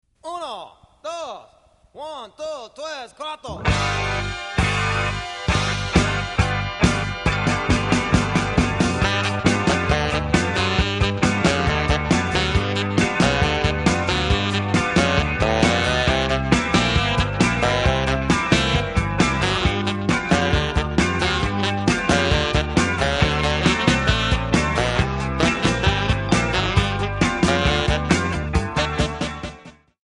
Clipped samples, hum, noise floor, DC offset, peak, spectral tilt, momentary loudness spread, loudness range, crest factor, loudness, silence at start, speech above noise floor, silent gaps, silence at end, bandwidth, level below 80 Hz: under 0.1%; none; -55 dBFS; under 0.1%; -2 dBFS; -5 dB/octave; 12 LU; 4 LU; 18 dB; -20 LUFS; 0.25 s; 30 dB; none; 0.35 s; 11.5 kHz; -30 dBFS